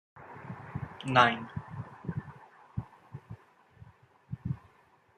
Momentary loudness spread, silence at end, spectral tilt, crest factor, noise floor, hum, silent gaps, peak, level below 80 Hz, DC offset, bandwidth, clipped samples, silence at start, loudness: 27 LU; 0.6 s; -6 dB/octave; 28 dB; -64 dBFS; none; none; -6 dBFS; -62 dBFS; under 0.1%; 9.8 kHz; under 0.1%; 0.15 s; -32 LUFS